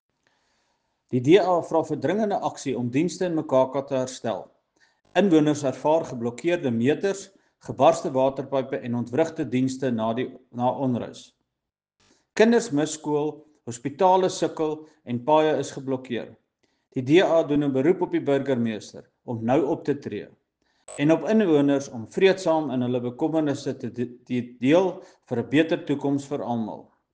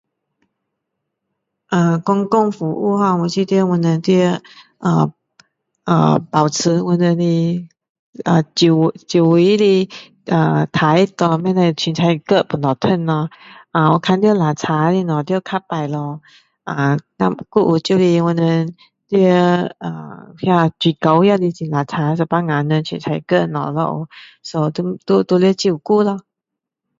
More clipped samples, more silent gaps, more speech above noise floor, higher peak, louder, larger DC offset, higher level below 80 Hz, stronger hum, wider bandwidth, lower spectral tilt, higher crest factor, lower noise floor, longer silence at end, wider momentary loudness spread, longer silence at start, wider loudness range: neither; second, none vs 7.89-8.13 s; second, 62 dB vs 67 dB; second, -4 dBFS vs 0 dBFS; second, -24 LUFS vs -16 LUFS; neither; second, -66 dBFS vs -58 dBFS; neither; first, 9.6 kHz vs 7.8 kHz; about the same, -6 dB/octave vs -6.5 dB/octave; about the same, 20 dB vs 16 dB; about the same, -85 dBFS vs -82 dBFS; second, 0.3 s vs 0.8 s; first, 14 LU vs 10 LU; second, 1.1 s vs 1.7 s; about the same, 3 LU vs 4 LU